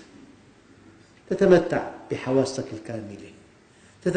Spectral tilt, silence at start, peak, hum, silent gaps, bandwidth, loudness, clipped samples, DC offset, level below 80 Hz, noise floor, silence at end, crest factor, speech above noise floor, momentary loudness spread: -6.5 dB/octave; 0 s; -4 dBFS; none; none; 9.4 kHz; -24 LUFS; under 0.1%; under 0.1%; -56 dBFS; -54 dBFS; 0 s; 22 dB; 31 dB; 17 LU